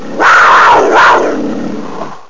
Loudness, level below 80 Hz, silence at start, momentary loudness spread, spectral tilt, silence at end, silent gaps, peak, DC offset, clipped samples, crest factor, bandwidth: -6 LUFS; -44 dBFS; 0 s; 17 LU; -3.5 dB/octave; 0 s; none; 0 dBFS; 6%; under 0.1%; 8 dB; 7.6 kHz